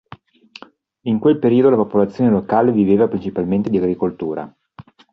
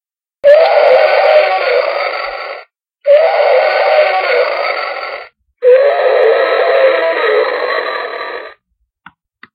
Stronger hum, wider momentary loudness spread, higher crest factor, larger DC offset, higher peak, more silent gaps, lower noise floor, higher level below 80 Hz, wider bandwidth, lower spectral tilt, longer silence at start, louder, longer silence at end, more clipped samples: neither; about the same, 12 LU vs 14 LU; about the same, 14 dB vs 12 dB; neither; about the same, -2 dBFS vs 0 dBFS; neither; second, -44 dBFS vs -65 dBFS; first, -52 dBFS vs -64 dBFS; first, 6 kHz vs 5.4 kHz; first, -10 dB/octave vs -2.5 dB/octave; first, 1.05 s vs 0.45 s; second, -17 LUFS vs -11 LUFS; second, 0.3 s vs 1 s; neither